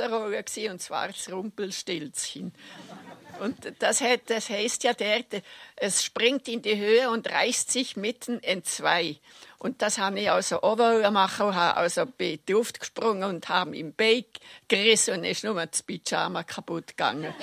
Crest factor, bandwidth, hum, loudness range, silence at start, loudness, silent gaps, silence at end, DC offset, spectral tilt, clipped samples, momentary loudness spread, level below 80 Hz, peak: 22 dB; 16 kHz; none; 5 LU; 0 s; -26 LUFS; none; 0 s; under 0.1%; -2 dB/octave; under 0.1%; 13 LU; -72 dBFS; -6 dBFS